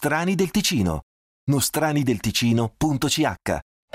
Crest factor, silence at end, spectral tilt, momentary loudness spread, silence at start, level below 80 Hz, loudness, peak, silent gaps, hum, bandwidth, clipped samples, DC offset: 14 dB; 0.35 s; -4.5 dB/octave; 7 LU; 0 s; -46 dBFS; -22 LUFS; -8 dBFS; 1.03-1.47 s; none; 16 kHz; under 0.1%; under 0.1%